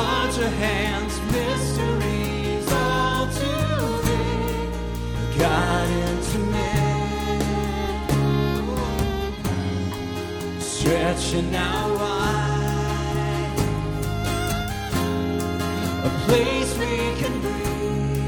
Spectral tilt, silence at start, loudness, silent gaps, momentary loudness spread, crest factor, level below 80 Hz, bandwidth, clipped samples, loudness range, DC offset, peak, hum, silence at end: -5.5 dB/octave; 0 s; -24 LUFS; none; 5 LU; 18 dB; -32 dBFS; 19.5 kHz; under 0.1%; 2 LU; under 0.1%; -4 dBFS; none; 0 s